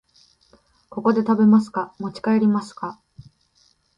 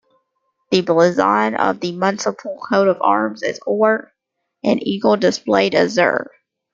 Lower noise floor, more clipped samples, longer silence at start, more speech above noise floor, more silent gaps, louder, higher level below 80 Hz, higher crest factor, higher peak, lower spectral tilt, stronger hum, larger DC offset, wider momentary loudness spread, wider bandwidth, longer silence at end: second, -62 dBFS vs -75 dBFS; neither; first, 0.95 s vs 0.7 s; second, 42 dB vs 58 dB; neither; second, -20 LUFS vs -17 LUFS; about the same, -64 dBFS vs -62 dBFS; about the same, 16 dB vs 16 dB; second, -6 dBFS vs -2 dBFS; first, -8 dB/octave vs -5 dB/octave; neither; neither; first, 17 LU vs 9 LU; first, 9.4 kHz vs 7.6 kHz; first, 1.05 s vs 0.5 s